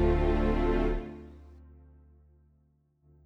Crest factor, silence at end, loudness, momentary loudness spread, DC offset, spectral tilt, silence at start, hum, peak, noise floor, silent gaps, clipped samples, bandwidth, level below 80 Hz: 16 dB; 1.7 s; -29 LUFS; 23 LU; under 0.1%; -9 dB/octave; 0 s; none; -14 dBFS; -68 dBFS; none; under 0.1%; 6 kHz; -34 dBFS